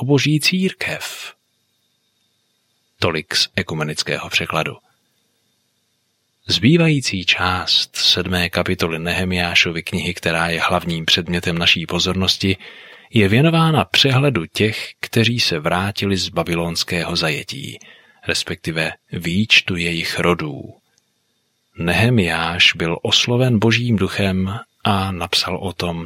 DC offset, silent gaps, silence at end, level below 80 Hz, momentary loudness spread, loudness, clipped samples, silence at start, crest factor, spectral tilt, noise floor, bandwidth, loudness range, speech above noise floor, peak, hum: under 0.1%; none; 0 s; -48 dBFS; 10 LU; -17 LUFS; under 0.1%; 0 s; 18 dB; -4.5 dB/octave; -67 dBFS; 16 kHz; 6 LU; 49 dB; 0 dBFS; none